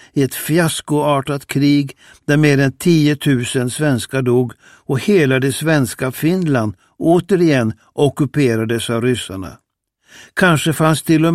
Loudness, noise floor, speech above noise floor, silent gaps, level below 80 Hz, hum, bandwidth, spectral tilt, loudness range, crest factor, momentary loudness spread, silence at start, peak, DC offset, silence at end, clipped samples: -16 LUFS; -54 dBFS; 38 dB; none; -52 dBFS; none; 15.5 kHz; -6 dB/octave; 2 LU; 16 dB; 8 LU; 0.15 s; 0 dBFS; 0.1%; 0 s; under 0.1%